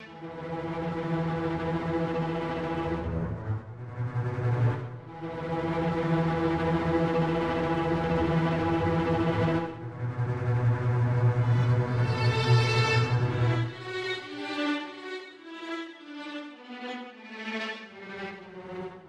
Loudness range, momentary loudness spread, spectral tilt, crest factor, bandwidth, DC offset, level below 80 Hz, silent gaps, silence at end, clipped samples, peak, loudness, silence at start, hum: 11 LU; 15 LU; -7.5 dB/octave; 16 dB; 8.8 kHz; under 0.1%; -50 dBFS; none; 0 s; under 0.1%; -12 dBFS; -28 LUFS; 0 s; none